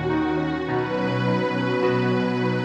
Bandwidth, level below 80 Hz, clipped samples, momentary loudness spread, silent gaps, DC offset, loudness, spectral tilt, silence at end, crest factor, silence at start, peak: 8.4 kHz; -50 dBFS; under 0.1%; 3 LU; none; under 0.1%; -23 LUFS; -7.5 dB/octave; 0 s; 12 dB; 0 s; -10 dBFS